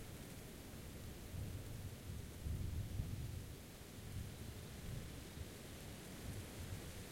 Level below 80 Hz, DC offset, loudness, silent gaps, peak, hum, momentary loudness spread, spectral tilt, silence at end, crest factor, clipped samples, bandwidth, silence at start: -56 dBFS; under 0.1%; -50 LUFS; none; -30 dBFS; none; 7 LU; -5 dB/octave; 0 s; 18 dB; under 0.1%; 16.5 kHz; 0 s